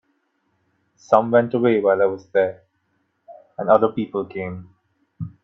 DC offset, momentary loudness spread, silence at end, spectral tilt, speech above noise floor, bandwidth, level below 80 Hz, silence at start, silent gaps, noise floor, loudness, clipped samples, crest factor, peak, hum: under 0.1%; 18 LU; 0.15 s; -8 dB/octave; 50 dB; 6.8 kHz; -62 dBFS; 1.1 s; none; -69 dBFS; -20 LUFS; under 0.1%; 22 dB; 0 dBFS; none